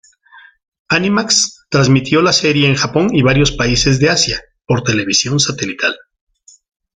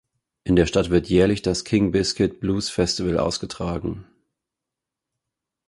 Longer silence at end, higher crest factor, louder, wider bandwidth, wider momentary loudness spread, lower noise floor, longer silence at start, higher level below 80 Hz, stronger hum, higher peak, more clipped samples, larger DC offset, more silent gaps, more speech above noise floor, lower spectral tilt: second, 1 s vs 1.65 s; second, 14 dB vs 20 dB; first, -13 LUFS vs -22 LUFS; second, 9.6 kHz vs 11.5 kHz; second, 6 LU vs 10 LU; second, -44 dBFS vs -86 dBFS; about the same, 0.35 s vs 0.45 s; about the same, -36 dBFS vs -40 dBFS; neither; about the same, 0 dBFS vs -2 dBFS; neither; neither; first, 0.68-0.72 s, 0.79-0.85 s vs none; second, 31 dB vs 65 dB; second, -4 dB/octave vs -5.5 dB/octave